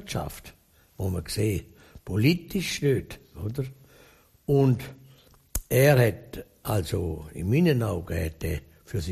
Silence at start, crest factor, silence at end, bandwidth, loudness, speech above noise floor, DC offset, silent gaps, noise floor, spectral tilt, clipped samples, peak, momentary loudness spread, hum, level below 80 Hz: 0 s; 22 dB; 0 s; 14.5 kHz; -26 LUFS; 31 dB; under 0.1%; none; -57 dBFS; -6 dB/octave; under 0.1%; -6 dBFS; 16 LU; none; -44 dBFS